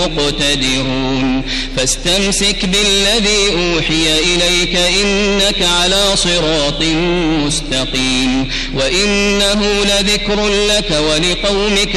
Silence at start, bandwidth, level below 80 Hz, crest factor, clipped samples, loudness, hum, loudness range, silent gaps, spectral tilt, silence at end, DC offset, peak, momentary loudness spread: 0 s; 13.5 kHz; -24 dBFS; 12 dB; under 0.1%; -12 LUFS; none; 2 LU; none; -3 dB/octave; 0 s; under 0.1%; -2 dBFS; 5 LU